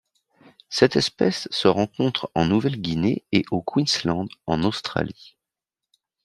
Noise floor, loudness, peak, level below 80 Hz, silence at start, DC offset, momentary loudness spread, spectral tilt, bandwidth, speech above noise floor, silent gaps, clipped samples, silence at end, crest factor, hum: -87 dBFS; -23 LUFS; -2 dBFS; -54 dBFS; 0.7 s; under 0.1%; 7 LU; -5.5 dB/octave; 13 kHz; 65 dB; none; under 0.1%; 0.95 s; 22 dB; none